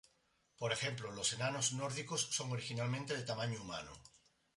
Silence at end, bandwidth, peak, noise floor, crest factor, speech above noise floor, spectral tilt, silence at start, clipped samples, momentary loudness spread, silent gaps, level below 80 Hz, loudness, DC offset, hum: 0.4 s; 11.5 kHz; -22 dBFS; -77 dBFS; 20 dB; 37 dB; -3 dB/octave; 0.6 s; under 0.1%; 9 LU; none; -72 dBFS; -39 LUFS; under 0.1%; none